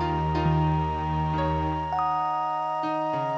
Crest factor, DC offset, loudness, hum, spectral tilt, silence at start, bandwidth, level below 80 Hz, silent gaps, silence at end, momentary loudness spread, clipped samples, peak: 12 dB; under 0.1%; -26 LUFS; none; -8.5 dB/octave; 0 s; 8 kHz; -38 dBFS; none; 0 s; 4 LU; under 0.1%; -14 dBFS